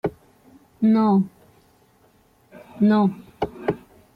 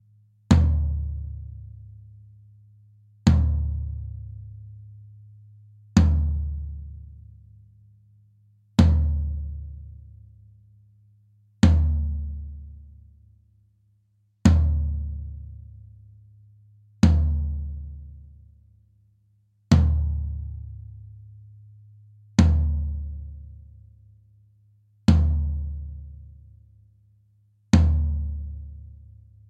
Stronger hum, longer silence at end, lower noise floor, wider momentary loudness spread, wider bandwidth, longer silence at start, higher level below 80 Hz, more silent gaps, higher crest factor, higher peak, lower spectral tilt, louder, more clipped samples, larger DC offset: neither; second, 0.4 s vs 0.65 s; second, -58 dBFS vs -66 dBFS; second, 13 LU vs 25 LU; second, 4.9 kHz vs 8.4 kHz; second, 0.05 s vs 0.5 s; second, -58 dBFS vs -32 dBFS; neither; second, 16 dB vs 22 dB; second, -8 dBFS vs -4 dBFS; first, -9.5 dB/octave vs -7.5 dB/octave; about the same, -22 LUFS vs -24 LUFS; neither; neither